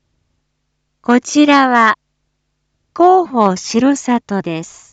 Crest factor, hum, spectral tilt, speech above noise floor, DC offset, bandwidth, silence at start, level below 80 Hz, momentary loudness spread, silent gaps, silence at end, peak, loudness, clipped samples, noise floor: 14 dB; none; -4.5 dB/octave; 56 dB; under 0.1%; 9 kHz; 1.1 s; -60 dBFS; 14 LU; none; 0.25 s; 0 dBFS; -13 LUFS; under 0.1%; -69 dBFS